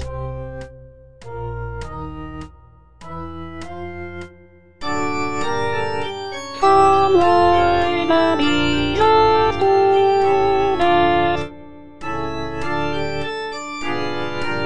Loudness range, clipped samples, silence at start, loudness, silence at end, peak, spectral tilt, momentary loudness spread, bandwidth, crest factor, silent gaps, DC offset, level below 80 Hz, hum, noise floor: 17 LU; under 0.1%; 0 s; -18 LUFS; 0 s; -2 dBFS; -5.5 dB/octave; 19 LU; 10 kHz; 18 dB; none; 3%; -40 dBFS; none; -47 dBFS